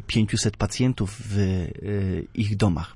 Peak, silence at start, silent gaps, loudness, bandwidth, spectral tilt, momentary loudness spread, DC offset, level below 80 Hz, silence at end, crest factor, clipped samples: -8 dBFS; 0 s; none; -25 LUFS; 11.5 kHz; -5.5 dB/octave; 5 LU; under 0.1%; -42 dBFS; 0.05 s; 16 dB; under 0.1%